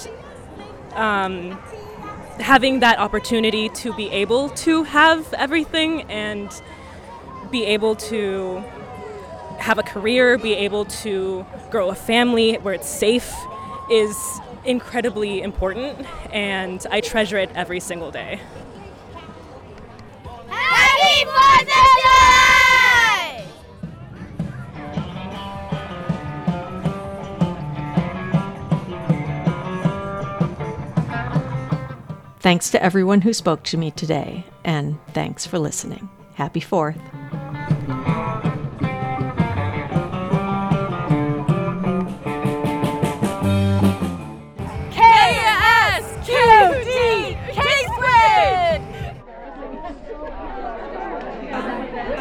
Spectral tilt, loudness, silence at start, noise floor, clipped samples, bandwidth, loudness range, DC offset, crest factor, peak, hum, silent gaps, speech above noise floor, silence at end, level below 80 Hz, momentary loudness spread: -4.5 dB/octave; -18 LUFS; 0 s; -39 dBFS; under 0.1%; 18 kHz; 11 LU; under 0.1%; 20 dB; 0 dBFS; none; none; 20 dB; 0 s; -42 dBFS; 22 LU